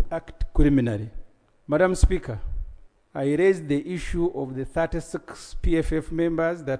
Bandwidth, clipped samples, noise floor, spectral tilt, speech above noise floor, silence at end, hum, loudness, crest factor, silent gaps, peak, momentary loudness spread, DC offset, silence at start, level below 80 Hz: 10.5 kHz; under 0.1%; -44 dBFS; -7 dB/octave; 21 dB; 0 s; none; -25 LUFS; 18 dB; none; -6 dBFS; 15 LU; under 0.1%; 0 s; -30 dBFS